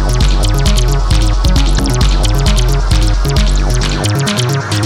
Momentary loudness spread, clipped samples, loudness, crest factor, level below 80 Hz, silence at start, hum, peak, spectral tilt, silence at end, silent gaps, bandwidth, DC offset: 1 LU; under 0.1%; -13 LUFS; 10 dB; -12 dBFS; 0 s; none; 0 dBFS; -4.5 dB/octave; 0 s; none; 14.5 kHz; under 0.1%